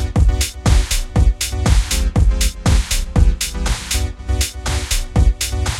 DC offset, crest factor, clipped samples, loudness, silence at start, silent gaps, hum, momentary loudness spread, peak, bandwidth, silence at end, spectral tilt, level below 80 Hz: under 0.1%; 14 dB; under 0.1%; -18 LUFS; 0 s; none; none; 4 LU; -2 dBFS; 16.5 kHz; 0 s; -4 dB/octave; -18 dBFS